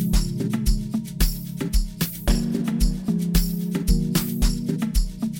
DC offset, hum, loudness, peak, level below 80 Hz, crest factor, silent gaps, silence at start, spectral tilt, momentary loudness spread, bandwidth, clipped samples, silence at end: under 0.1%; none; -24 LUFS; -6 dBFS; -24 dBFS; 16 dB; none; 0 s; -5.5 dB/octave; 4 LU; 17 kHz; under 0.1%; 0 s